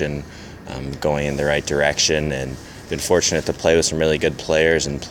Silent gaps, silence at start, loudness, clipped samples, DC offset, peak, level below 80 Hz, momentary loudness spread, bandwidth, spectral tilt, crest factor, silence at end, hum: none; 0 s; -19 LUFS; under 0.1%; under 0.1%; -2 dBFS; -38 dBFS; 14 LU; 17 kHz; -3.5 dB/octave; 18 dB; 0 s; none